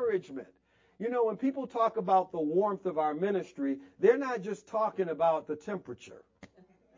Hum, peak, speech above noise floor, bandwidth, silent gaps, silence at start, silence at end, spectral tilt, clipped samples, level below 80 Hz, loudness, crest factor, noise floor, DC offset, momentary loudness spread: none; -12 dBFS; 32 dB; 7.6 kHz; none; 0 s; 0.5 s; -7 dB/octave; under 0.1%; -76 dBFS; -31 LUFS; 18 dB; -63 dBFS; under 0.1%; 12 LU